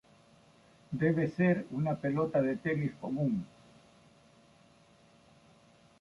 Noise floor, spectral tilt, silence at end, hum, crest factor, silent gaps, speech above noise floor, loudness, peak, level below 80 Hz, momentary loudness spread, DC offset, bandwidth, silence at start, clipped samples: -62 dBFS; -9 dB/octave; 2.55 s; none; 18 dB; none; 31 dB; -32 LUFS; -16 dBFS; -68 dBFS; 7 LU; under 0.1%; 11 kHz; 0.9 s; under 0.1%